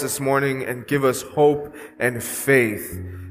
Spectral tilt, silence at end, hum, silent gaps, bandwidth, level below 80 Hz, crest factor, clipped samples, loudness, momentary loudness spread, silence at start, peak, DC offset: -5 dB/octave; 0 s; none; none; 15.5 kHz; -54 dBFS; 18 dB; under 0.1%; -21 LUFS; 12 LU; 0 s; -2 dBFS; under 0.1%